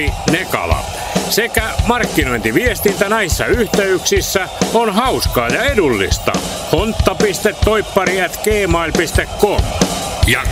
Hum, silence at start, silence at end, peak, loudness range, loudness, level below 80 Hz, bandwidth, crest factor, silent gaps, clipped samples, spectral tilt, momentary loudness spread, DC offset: none; 0 s; 0 s; 0 dBFS; 1 LU; -15 LUFS; -26 dBFS; 16 kHz; 14 dB; none; under 0.1%; -4 dB/octave; 3 LU; under 0.1%